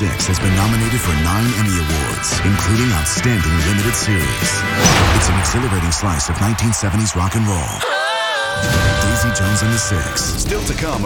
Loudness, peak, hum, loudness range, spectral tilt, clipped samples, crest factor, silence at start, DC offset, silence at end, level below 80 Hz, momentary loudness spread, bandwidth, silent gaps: -16 LUFS; 0 dBFS; none; 2 LU; -4 dB/octave; under 0.1%; 16 dB; 0 s; under 0.1%; 0 s; -28 dBFS; 4 LU; 18.5 kHz; none